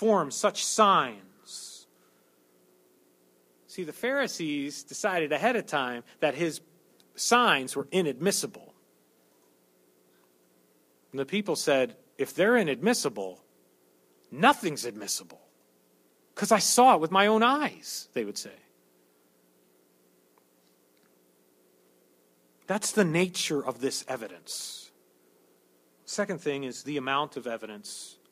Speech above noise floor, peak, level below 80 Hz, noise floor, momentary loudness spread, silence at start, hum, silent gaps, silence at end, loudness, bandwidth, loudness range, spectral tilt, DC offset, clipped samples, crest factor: 38 dB; -6 dBFS; -78 dBFS; -65 dBFS; 18 LU; 0 s; none; none; 0.2 s; -27 LUFS; 15.5 kHz; 11 LU; -3 dB/octave; under 0.1%; under 0.1%; 24 dB